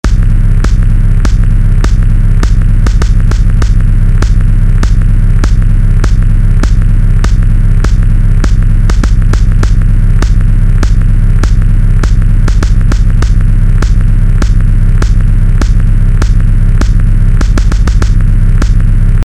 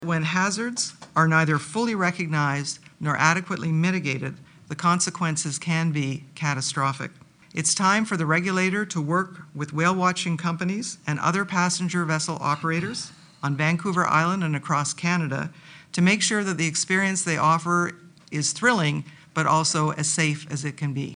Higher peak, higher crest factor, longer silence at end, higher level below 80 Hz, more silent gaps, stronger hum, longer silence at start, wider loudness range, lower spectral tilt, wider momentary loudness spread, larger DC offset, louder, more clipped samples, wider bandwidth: about the same, 0 dBFS vs -2 dBFS; second, 6 dB vs 22 dB; about the same, 0 s vs 0 s; first, -6 dBFS vs -64 dBFS; neither; neither; about the same, 0.05 s vs 0 s; about the same, 0 LU vs 2 LU; first, -7 dB/octave vs -4 dB/octave; second, 0 LU vs 10 LU; neither; first, -10 LUFS vs -24 LUFS; neither; second, 8.4 kHz vs 10.5 kHz